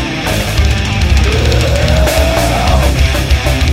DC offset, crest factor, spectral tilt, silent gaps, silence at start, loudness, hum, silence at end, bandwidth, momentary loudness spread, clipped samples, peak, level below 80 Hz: under 0.1%; 10 dB; -5 dB/octave; none; 0 s; -12 LUFS; none; 0 s; 16.5 kHz; 2 LU; under 0.1%; 0 dBFS; -14 dBFS